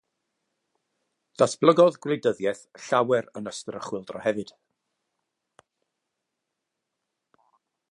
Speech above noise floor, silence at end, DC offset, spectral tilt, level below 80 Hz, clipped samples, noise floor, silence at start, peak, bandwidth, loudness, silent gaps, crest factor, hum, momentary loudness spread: 59 dB; 3.5 s; under 0.1%; -5 dB/octave; -74 dBFS; under 0.1%; -83 dBFS; 1.4 s; -2 dBFS; 11 kHz; -25 LUFS; none; 26 dB; none; 16 LU